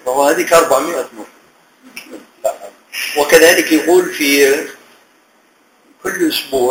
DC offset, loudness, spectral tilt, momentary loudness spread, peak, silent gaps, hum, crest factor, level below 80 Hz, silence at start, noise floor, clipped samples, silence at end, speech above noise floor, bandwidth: under 0.1%; -13 LUFS; -2 dB/octave; 22 LU; 0 dBFS; none; none; 14 dB; -52 dBFS; 0.05 s; -53 dBFS; 0.1%; 0 s; 40 dB; over 20 kHz